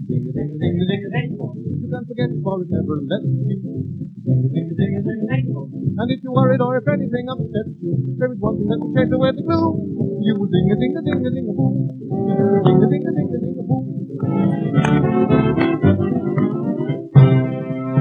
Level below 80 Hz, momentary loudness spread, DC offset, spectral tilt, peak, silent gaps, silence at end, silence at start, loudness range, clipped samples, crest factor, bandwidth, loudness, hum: -48 dBFS; 9 LU; under 0.1%; -9.5 dB/octave; 0 dBFS; none; 0 s; 0 s; 5 LU; under 0.1%; 18 dB; 6.8 kHz; -19 LUFS; none